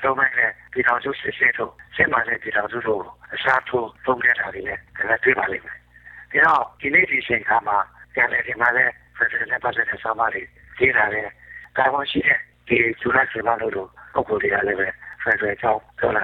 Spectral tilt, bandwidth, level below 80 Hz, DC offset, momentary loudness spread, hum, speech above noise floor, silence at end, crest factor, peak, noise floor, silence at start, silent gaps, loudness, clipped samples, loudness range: -6.5 dB/octave; 7.2 kHz; -54 dBFS; under 0.1%; 10 LU; none; 24 dB; 0 s; 18 dB; -4 dBFS; -45 dBFS; 0 s; none; -20 LUFS; under 0.1%; 2 LU